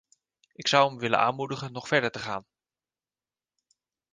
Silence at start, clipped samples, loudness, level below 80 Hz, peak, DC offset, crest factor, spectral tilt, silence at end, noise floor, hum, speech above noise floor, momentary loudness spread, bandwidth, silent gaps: 0.6 s; under 0.1%; -26 LUFS; -70 dBFS; -6 dBFS; under 0.1%; 24 dB; -4 dB/octave; 1.7 s; under -90 dBFS; none; over 63 dB; 13 LU; 9.8 kHz; none